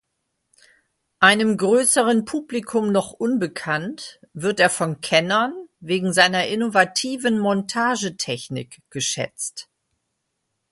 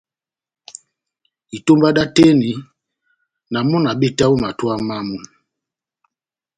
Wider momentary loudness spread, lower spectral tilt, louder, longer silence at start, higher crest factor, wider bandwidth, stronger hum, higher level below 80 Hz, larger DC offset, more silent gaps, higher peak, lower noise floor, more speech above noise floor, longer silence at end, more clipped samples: second, 13 LU vs 21 LU; second, -3.5 dB/octave vs -6 dB/octave; second, -20 LUFS vs -16 LUFS; second, 1.2 s vs 1.55 s; about the same, 22 dB vs 18 dB; first, 12 kHz vs 9.4 kHz; neither; second, -64 dBFS vs -50 dBFS; neither; neither; about the same, 0 dBFS vs 0 dBFS; second, -76 dBFS vs -88 dBFS; second, 55 dB vs 72 dB; second, 1.1 s vs 1.3 s; neither